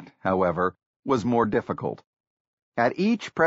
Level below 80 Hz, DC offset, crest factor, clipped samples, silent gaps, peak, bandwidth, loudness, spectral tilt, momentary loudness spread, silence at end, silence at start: -58 dBFS; under 0.1%; 18 dB; under 0.1%; 0.86-1.03 s, 2.07-2.72 s; -8 dBFS; 7.6 kHz; -25 LUFS; -5.5 dB/octave; 12 LU; 0 s; 0 s